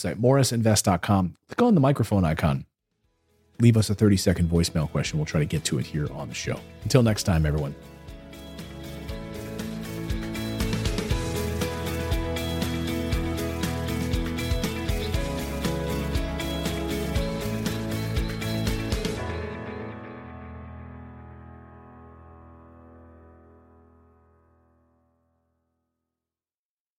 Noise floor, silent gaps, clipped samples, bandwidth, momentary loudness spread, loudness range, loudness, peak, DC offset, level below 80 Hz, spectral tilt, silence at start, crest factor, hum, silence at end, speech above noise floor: under -90 dBFS; none; under 0.1%; 16.5 kHz; 20 LU; 11 LU; -26 LUFS; -4 dBFS; under 0.1%; -38 dBFS; -5.5 dB/octave; 0 s; 22 dB; none; 3.7 s; over 68 dB